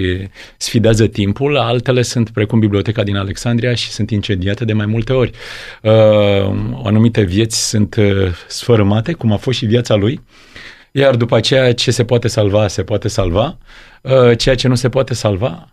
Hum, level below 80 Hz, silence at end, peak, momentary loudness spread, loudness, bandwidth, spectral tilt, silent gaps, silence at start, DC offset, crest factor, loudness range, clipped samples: none; -36 dBFS; 0.1 s; 0 dBFS; 8 LU; -14 LUFS; 13.5 kHz; -5.5 dB/octave; none; 0 s; under 0.1%; 14 dB; 2 LU; under 0.1%